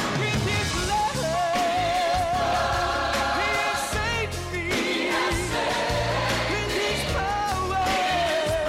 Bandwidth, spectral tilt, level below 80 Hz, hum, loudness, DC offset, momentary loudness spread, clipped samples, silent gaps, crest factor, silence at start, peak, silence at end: 16 kHz; -3.5 dB/octave; -38 dBFS; none; -24 LUFS; under 0.1%; 2 LU; under 0.1%; none; 8 dB; 0 s; -16 dBFS; 0 s